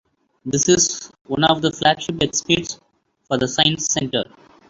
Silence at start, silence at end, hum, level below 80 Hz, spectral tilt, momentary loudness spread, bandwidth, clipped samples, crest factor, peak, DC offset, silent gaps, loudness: 0.45 s; 0.45 s; none; -50 dBFS; -3 dB/octave; 14 LU; 8 kHz; under 0.1%; 20 dB; -2 dBFS; under 0.1%; 1.21-1.25 s; -19 LUFS